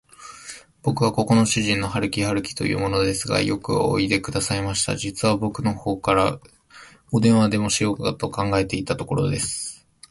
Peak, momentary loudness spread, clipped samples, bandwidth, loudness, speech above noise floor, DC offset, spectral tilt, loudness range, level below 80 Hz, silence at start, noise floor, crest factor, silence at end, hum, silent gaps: -4 dBFS; 8 LU; under 0.1%; 12 kHz; -22 LUFS; 26 dB; under 0.1%; -4.5 dB/octave; 1 LU; -46 dBFS; 0.2 s; -48 dBFS; 18 dB; 0.35 s; none; none